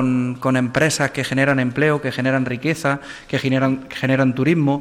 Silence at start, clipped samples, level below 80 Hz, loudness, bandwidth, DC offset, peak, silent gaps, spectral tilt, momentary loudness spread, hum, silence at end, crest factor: 0 s; under 0.1%; -52 dBFS; -19 LUFS; 15 kHz; under 0.1%; -6 dBFS; none; -6 dB/octave; 5 LU; none; 0 s; 14 dB